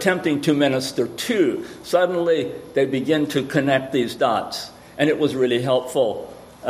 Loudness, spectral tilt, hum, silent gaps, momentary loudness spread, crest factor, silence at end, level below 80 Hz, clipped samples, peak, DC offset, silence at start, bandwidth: -21 LUFS; -5 dB/octave; none; none; 6 LU; 18 dB; 0 s; -58 dBFS; under 0.1%; -2 dBFS; under 0.1%; 0 s; 15.5 kHz